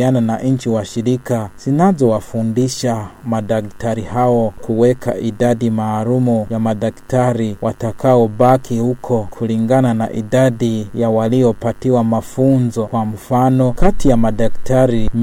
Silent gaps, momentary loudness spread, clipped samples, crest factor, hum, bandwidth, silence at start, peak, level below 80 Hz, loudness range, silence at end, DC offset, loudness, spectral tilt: none; 7 LU; under 0.1%; 14 dB; none; 16 kHz; 0 s; 0 dBFS; -30 dBFS; 2 LU; 0 s; under 0.1%; -16 LUFS; -7.5 dB/octave